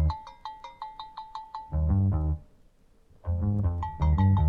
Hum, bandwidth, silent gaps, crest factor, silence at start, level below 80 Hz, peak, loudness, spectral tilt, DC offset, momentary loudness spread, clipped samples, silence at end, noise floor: none; 4.7 kHz; none; 14 dB; 0 s; -34 dBFS; -12 dBFS; -28 LUFS; -9.5 dB/octave; under 0.1%; 17 LU; under 0.1%; 0 s; -59 dBFS